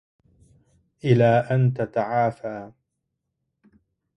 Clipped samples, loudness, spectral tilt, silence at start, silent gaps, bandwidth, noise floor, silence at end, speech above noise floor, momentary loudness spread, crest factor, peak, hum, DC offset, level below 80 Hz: under 0.1%; -22 LUFS; -9 dB/octave; 1.05 s; none; 6 kHz; -79 dBFS; 1.5 s; 58 dB; 16 LU; 20 dB; -6 dBFS; none; under 0.1%; -60 dBFS